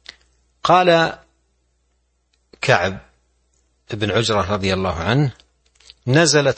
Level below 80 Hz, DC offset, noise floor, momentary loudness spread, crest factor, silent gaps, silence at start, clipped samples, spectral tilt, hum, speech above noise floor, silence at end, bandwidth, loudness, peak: -48 dBFS; under 0.1%; -66 dBFS; 13 LU; 20 dB; none; 0.65 s; under 0.1%; -4.5 dB/octave; none; 49 dB; 0.05 s; 8.8 kHz; -18 LUFS; 0 dBFS